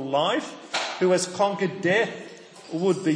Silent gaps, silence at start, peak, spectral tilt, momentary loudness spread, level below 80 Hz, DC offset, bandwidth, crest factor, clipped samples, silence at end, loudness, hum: none; 0 s; -10 dBFS; -4.5 dB/octave; 14 LU; -74 dBFS; under 0.1%; 10.5 kHz; 16 dB; under 0.1%; 0 s; -25 LUFS; none